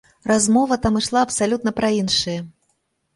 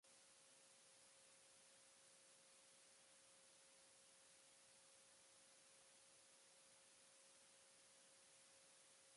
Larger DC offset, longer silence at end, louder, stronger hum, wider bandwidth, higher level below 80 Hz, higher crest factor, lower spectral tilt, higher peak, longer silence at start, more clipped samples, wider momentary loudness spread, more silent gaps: neither; first, 0.65 s vs 0 s; first, -19 LUFS vs -68 LUFS; neither; about the same, 11.5 kHz vs 11.5 kHz; first, -46 dBFS vs under -90 dBFS; about the same, 16 dB vs 14 dB; first, -3.5 dB/octave vs 0 dB/octave; first, -4 dBFS vs -58 dBFS; first, 0.25 s vs 0.05 s; neither; first, 8 LU vs 0 LU; neither